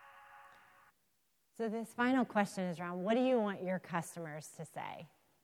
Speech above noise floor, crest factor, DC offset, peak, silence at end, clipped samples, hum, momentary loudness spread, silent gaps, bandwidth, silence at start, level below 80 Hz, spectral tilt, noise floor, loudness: 43 dB; 18 dB; under 0.1%; -20 dBFS; 0.4 s; under 0.1%; none; 16 LU; none; 16 kHz; 0 s; -86 dBFS; -6 dB/octave; -79 dBFS; -37 LUFS